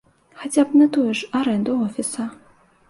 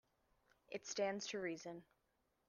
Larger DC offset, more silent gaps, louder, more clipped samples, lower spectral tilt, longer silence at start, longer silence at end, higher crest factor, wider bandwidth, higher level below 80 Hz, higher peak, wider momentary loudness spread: neither; neither; first, -20 LUFS vs -45 LUFS; neither; first, -4.5 dB/octave vs -3 dB/octave; second, 0.4 s vs 0.7 s; about the same, 0.55 s vs 0.65 s; about the same, 16 dB vs 20 dB; first, 11.5 kHz vs 10 kHz; first, -64 dBFS vs -86 dBFS; first, -6 dBFS vs -28 dBFS; about the same, 14 LU vs 12 LU